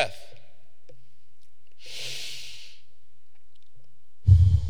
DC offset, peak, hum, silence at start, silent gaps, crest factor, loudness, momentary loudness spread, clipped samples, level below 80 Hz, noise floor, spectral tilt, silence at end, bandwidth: 3%; -4 dBFS; none; 0 s; none; 22 dB; -25 LUFS; 30 LU; under 0.1%; -38 dBFS; -69 dBFS; -5.5 dB/octave; 0 s; 11.5 kHz